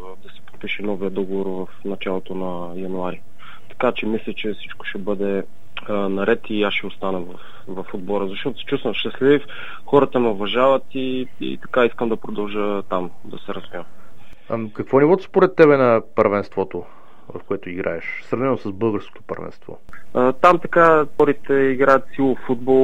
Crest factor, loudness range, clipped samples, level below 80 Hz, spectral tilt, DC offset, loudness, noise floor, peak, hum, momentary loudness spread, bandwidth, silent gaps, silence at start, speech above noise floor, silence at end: 20 dB; 8 LU; under 0.1%; -54 dBFS; -7.5 dB/octave; 5%; -20 LUFS; -46 dBFS; 0 dBFS; none; 18 LU; 8.6 kHz; none; 0 s; 26 dB; 0 s